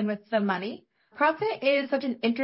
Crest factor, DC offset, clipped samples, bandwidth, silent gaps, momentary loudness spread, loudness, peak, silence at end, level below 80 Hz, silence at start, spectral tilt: 18 dB; under 0.1%; under 0.1%; 5.8 kHz; none; 7 LU; -27 LUFS; -10 dBFS; 0 s; -78 dBFS; 0 s; -9.5 dB/octave